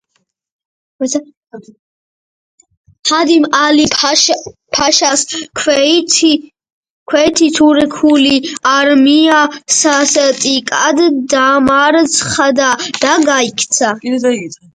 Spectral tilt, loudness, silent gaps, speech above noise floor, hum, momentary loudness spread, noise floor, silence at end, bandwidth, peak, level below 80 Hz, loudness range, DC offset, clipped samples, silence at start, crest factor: -1.5 dB/octave; -11 LUFS; 1.37-1.43 s, 1.79-2.58 s, 2.77-2.84 s, 2.99-3.03 s, 6.72-6.83 s, 6.90-7.06 s; 54 dB; none; 7 LU; -65 dBFS; 0.2 s; 10.5 kHz; 0 dBFS; -50 dBFS; 4 LU; under 0.1%; under 0.1%; 1 s; 12 dB